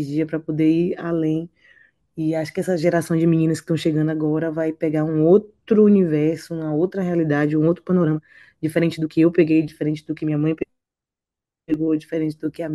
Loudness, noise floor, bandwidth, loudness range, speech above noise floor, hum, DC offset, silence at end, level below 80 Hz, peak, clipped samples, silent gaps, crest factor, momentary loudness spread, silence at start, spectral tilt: -20 LUFS; -88 dBFS; 12.5 kHz; 3 LU; 68 dB; none; under 0.1%; 0 s; -58 dBFS; -4 dBFS; under 0.1%; none; 16 dB; 10 LU; 0 s; -8 dB/octave